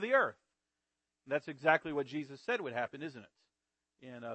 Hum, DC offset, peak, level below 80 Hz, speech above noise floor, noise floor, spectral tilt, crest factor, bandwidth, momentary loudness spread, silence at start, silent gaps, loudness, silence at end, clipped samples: none; under 0.1%; -12 dBFS; -80 dBFS; 54 dB; -89 dBFS; -6 dB/octave; 24 dB; 8.4 kHz; 16 LU; 0 s; none; -35 LUFS; 0 s; under 0.1%